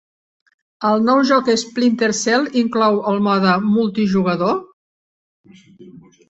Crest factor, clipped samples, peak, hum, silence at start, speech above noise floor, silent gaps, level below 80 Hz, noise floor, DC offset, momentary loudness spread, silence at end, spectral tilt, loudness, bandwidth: 16 dB; under 0.1%; -2 dBFS; none; 0.8 s; 27 dB; 4.73-5.44 s; -60 dBFS; -43 dBFS; under 0.1%; 4 LU; 0.3 s; -5 dB/octave; -17 LUFS; 8.2 kHz